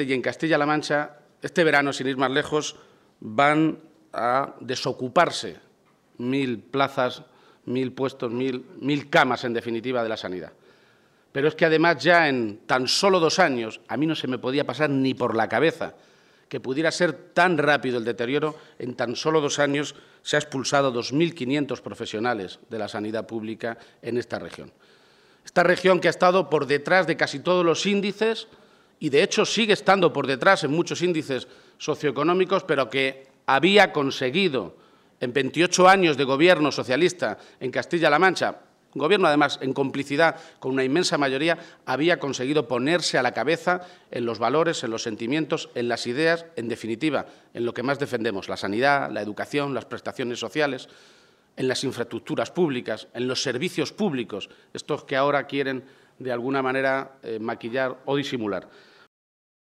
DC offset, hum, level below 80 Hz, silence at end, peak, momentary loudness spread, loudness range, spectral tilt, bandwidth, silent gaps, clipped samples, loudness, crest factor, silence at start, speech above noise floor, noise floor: under 0.1%; none; -70 dBFS; 0.95 s; -4 dBFS; 13 LU; 7 LU; -4.5 dB/octave; 13.5 kHz; none; under 0.1%; -23 LUFS; 20 dB; 0 s; 37 dB; -60 dBFS